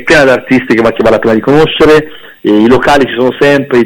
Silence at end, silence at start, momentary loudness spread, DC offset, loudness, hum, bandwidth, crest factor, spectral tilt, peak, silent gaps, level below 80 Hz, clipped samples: 0 s; 0 s; 4 LU; under 0.1%; -7 LUFS; none; 18 kHz; 6 dB; -5.5 dB/octave; 0 dBFS; none; -32 dBFS; 1%